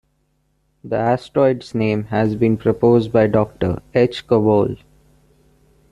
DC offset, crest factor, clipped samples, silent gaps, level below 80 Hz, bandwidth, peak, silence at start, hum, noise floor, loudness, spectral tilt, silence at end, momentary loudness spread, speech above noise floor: under 0.1%; 16 dB; under 0.1%; none; -48 dBFS; 11 kHz; -2 dBFS; 0.85 s; none; -65 dBFS; -18 LUFS; -8.5 dB/octave; 1.15 s; 6 LU; 48 dB